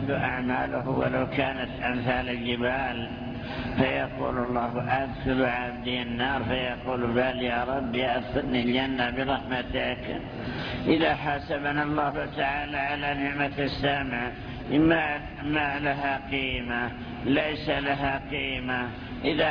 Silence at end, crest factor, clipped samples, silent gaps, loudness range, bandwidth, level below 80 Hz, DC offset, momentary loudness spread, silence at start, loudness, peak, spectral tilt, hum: 0 s; 20 dB; under 0.1%; none; 2 LU; 5.4 kHz; -44 dBFS; under 0.1%; 6 LU; 0 s; -28 LUFS; -8 dBFS; -8 dB/octave; none